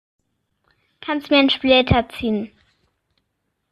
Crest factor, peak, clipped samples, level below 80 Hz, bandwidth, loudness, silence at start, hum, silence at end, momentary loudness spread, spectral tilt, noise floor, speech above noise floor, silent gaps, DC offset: 20 dB; -2 dBFS; under 0.1%; -42 dBFS; 12.5 kHz; -18 LUFS; 1.05 s; none; 1.25 s; 14 LU; -7 dB/octave; -74 dBFS; 56 dB; none; under 0.1%